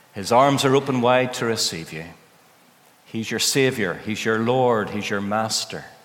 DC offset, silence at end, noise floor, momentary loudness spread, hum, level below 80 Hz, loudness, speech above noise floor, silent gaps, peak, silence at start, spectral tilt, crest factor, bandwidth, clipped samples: under 0.1%; 0.15 s; -54 dBFS; 14 LU; none; -66 dBFS; -21 LUFS; 33 dB; none; -2 dBFS; 0.15 s; -4 dB/octave; 20 dB; 18 kHz; under 0.1%